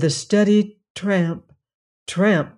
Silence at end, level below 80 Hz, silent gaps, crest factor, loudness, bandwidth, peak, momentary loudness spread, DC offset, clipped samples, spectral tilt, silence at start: 0.1 s; -62 dBFS; 0.90-0.95 s, 1.74-2.06 s; 14 dB; -20 LUFS; 11 kHz; -6 dBFS; 14 LU; under 0.1%; under 0.1%; -5.5 dB/octave; 0 s